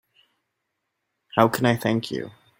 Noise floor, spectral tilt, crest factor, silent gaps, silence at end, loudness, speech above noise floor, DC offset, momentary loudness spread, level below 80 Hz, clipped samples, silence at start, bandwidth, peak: -79 dBFS; -6 dB/octave; 24 dB; none; 0.3 s; -23 LUFS; 57 dB; under 0.1%; 12 LU; -62 dBFS; under 0.1%; 1.35 s; 16.5 kHz; -2 dBFS